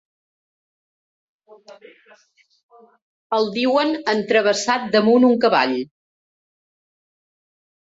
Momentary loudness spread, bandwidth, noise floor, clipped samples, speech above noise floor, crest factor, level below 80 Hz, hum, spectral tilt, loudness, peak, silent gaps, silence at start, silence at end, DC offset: 8 LU; 8 kHz; under -90 dBFS; under 0.1%; over 71 dB; 18 dB; -68 dBFS; none; -4 dB/octave; -18 LUFS; -4 dBFS; 2.63-2.69 s, 3.02-3.30 s; 1.7 s; 2.1 s; under 0.1%